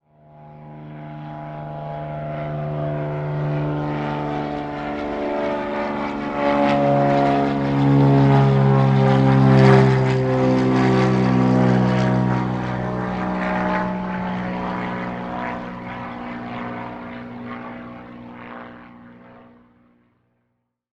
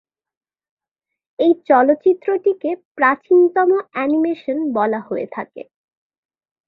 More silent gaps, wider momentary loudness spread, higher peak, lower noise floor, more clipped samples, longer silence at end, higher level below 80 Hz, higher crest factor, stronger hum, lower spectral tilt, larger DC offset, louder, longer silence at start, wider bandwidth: second, none vs 2.85-2.95 s; first, 19 LU vs 11 LU; about the same, 0 dBFS vs -2 dBFS; second, -73 dBFS vs -83 dBFS; neither; first, 1.65 s vs 1.05 s; first, -46 dBFS vs -68 dBFS; about the same, 20 dB vs 16 dB; neither; about the same, -8.5 dB/octave vs -8.5 dB/octave; neither; about the same, -19 LUFS vs -17 LUFS; second, 0.4 s vs 1.4 s; first, 7.8 kHz vs 4.6 kHz